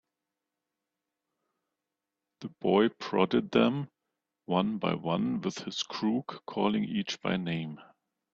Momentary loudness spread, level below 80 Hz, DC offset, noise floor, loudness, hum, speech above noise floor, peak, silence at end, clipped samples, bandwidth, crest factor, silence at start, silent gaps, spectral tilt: 12 LU; -68 dBFS; under 0.1%; -88 dBFS; -30 LUFS; none; 58 dB; -10 dBFS; 0.5 s; under 0.1%; 7.6 kHz; 22 dB; 2.4 s; none; -6 dB/octave